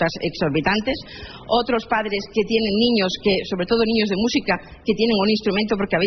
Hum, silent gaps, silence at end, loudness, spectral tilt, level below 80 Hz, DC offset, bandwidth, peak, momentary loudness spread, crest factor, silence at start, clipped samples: none; none; 0 s; -20 LUFS; -3.5 dB/octave; -46 dBFS; under 0.1%; 6.4 kHz; -6 dBFS; 6 LU; 16 dB; 0 s; under 0.1%